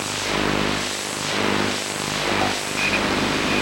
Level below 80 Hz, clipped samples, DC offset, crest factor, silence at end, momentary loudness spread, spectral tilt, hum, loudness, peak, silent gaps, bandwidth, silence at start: -44 dBFS; under 0.1%; under 0.1%; 16 dB; 0 s; 4 LU; -3 dB/octave; 50 Hz at -40 dBFS; -21 LUFS; -6 dBFS; none; 16 kHz; 0 s